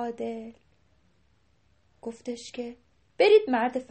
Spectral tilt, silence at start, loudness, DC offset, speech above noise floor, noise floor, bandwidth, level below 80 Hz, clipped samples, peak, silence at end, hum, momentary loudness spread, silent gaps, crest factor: -4 dB/octave; 0 s; -25 LUFS; under 0.1%; 41 dB; -67 dBFS; 8.4 kHz; -70 dBFS; under 0.1%; -8 dBFS; 0.1 s; none; 21 LU; none; 20 dB